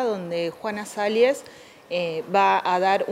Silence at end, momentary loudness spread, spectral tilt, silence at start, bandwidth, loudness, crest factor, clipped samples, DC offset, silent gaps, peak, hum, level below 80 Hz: 0 s; 10 LU; -4.5 dB/octave; 0 s; 15.5 kHz; -23 LUFS; 16 dB; under 0.1%; under 0.1%; none; -8 dBFS; none; -74 dBFS